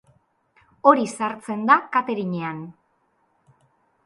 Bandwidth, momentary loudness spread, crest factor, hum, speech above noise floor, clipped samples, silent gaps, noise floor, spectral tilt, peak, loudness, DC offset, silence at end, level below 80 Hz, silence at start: 11.5 kHz; 14 LU; 22 dB; none; 46 dB; under 0.1%; none; -67 dBFS; -6 dB/octave; -2 dBFS; -21 LUFS; under 0.1%; 1.35 s; -74 dBFS; 0.85 s